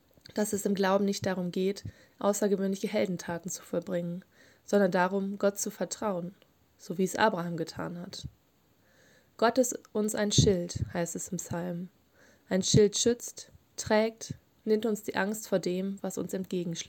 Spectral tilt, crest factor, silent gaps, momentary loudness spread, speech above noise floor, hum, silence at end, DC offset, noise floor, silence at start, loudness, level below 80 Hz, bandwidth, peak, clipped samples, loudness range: -4.5 dB/octave; 22 dB; none; 15 LU; 37 dB; none; 0 s; under 0.1%; -67 dBFS; 0.35 s; -30 LUFS; -58 dBFS; 17 kHz; -10 dBFS; under 0.1%; 4 LU